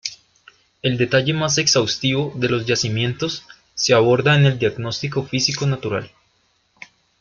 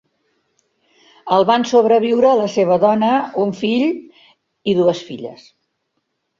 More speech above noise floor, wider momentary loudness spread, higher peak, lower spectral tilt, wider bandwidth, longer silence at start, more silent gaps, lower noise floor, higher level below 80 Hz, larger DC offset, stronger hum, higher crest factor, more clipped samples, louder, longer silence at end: second, 45 dB vs 56 dB; second, 11 LU vs 16 LU; about the same, -2 dBFS vs -2 dBFS; second, -4 dB/octave vs -6 dB/octave; about the same, 7.6 kHz vs 7.6 kHz; second, 0.05 s vs 1.25 s; neither; second, -63 dBFS vs -72 dBFS; first, -54 dBFS vs -62 dBFS; neither; neither; about the same, 18 dB vs 16 dB; neither; second, -19 LUFS vs -16 LUFS; about the same, 1.15 s vs 1.05 s